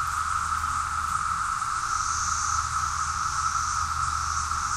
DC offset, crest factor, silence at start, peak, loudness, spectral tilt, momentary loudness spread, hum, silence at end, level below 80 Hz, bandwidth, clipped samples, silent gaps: under 0.1%; 14 dB; 0 s; -14 dBFS; -26 LUFS; -0.5 dB/octave; 2 LU; none; 0 s; -42 dBFS; 15 kHz; under 0.1%; none